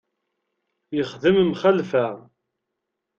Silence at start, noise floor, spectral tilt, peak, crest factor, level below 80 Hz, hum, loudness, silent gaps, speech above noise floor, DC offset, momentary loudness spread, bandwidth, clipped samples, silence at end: 0.9 s; -81 dBFS; -7 dB/octave; -4 dBFS; 18 dB; -62 dBFS; none; -21 LUFS; none; 60 dB; under 0.1%; 11 LU; 7 kHz; under 0.1%; 1 s